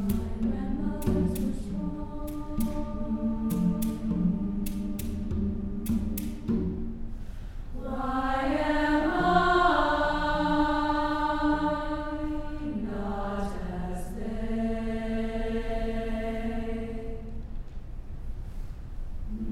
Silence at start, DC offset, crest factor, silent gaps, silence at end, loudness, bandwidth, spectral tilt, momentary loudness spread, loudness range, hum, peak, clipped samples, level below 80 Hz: 0 s; under 0.1%; 20 dB; none; 0 s; -30 LUFS; 16 kHz; -6.5 dB/octave; 16 LU; 8 LU; none; -10 dBFS; under 0.1%; -36 dBFS